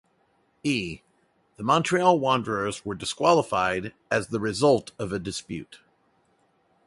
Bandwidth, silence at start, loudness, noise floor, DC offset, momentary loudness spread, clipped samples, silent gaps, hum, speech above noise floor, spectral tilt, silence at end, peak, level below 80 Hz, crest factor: 11.5 kHz; 0.65 s; -25 LUFS; -67 dBFS; under 0.1%; 12 LU; under 0.1%; none; none; 42 dB; -5 dB/octave; 1.1 s; -6 dBFS; -56 dBFS; 22 dB